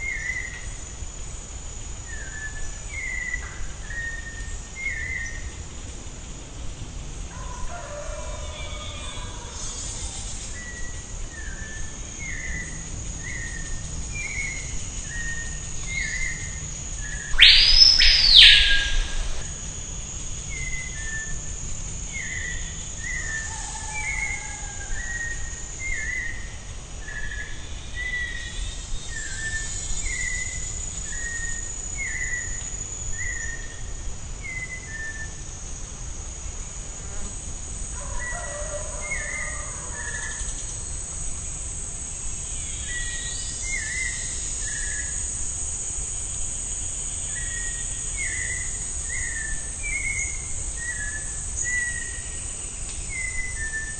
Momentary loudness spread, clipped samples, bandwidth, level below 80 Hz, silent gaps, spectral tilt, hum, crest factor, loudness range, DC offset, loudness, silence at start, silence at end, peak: 10 LU; under 0.1%; 9.4 kHz; -34 dBFS; none; -0.5 dB/octave; none; 26 dB; 17 LU; 0.3%; -24 LUFS; 0 s; 0 s; 0 dBFS